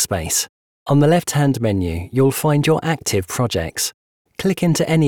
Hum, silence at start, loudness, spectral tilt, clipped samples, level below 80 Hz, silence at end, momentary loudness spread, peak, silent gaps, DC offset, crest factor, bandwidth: none; 0 s; -18 LUFS; -5 dB/octave; under 0.1%; -46 dBFS; 0 s; 8 LU; -4 dBFS; 0.49-0.86 s, 3.94-4.25 s; 0.3%; 14 dB; 19 kHz